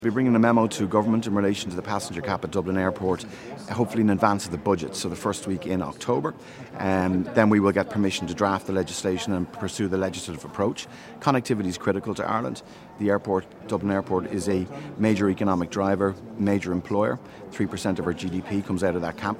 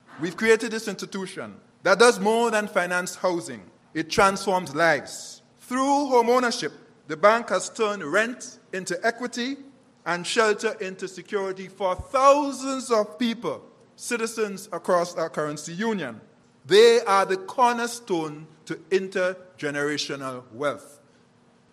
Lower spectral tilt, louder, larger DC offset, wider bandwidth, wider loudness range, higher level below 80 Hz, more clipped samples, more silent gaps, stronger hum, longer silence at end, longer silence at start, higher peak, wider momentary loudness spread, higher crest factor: first, -6 dB/octave vs -3.5 dB/octave; about the same, -25 LUFS vs -24 LUFS; neither; about the same, 16 kHz vs 15 kHz; about the same, 3 LU vs 5 LU; about the same, -56 dBFS vs -60 dBFS; neither; neither; neither; second, 0 s vs 0.85 s; about the same, 0 s vs 0.1 s; about the same, -2 dBFS vs -4 dBFS; second, 9 LU vs 16 LU; about the same, 24 dB vs 22 dB